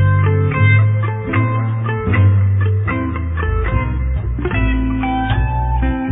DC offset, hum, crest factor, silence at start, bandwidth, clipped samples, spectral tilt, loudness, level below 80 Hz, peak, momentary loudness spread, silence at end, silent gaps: under 0.1%; none; 14 dB; 0 s; 3.9 kHz; under 0.1%; -11.5 dB/octave; -17 LUFS; -22 dBFS; -2 dBFS; 7 LU; 0 s; none